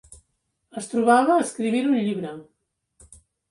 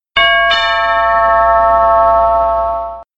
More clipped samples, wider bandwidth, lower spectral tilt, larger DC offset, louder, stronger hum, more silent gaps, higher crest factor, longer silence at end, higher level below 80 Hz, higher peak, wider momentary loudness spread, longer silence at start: neither; first, 11.5 kHz vs 7.8 kHz; first, -5 dB/octave vs -3.5 dB/octave; second, under 0.1% vs 0.6%; second, -21 LUFS vs -11 LUFS; neither; neither; first, 18 dB vs 12 dB; first, 1.1 s vs 0.15 s; second, -64 dBFS vs -34 dBFS; second, -6 dBFS vs 0 dBFS; first, 18 LU vs 5 LU; about the same, 0.1 s vs 0.15 s